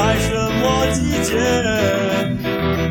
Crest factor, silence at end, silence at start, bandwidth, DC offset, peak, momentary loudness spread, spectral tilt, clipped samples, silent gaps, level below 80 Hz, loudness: 14 dB; 0 s; 0 s; 19.5 kHz; under 0.1%; -4 dBFS; 3 LU; -5 dB/octave; under 0.1%; none; -32 dBFS; -18 LUFS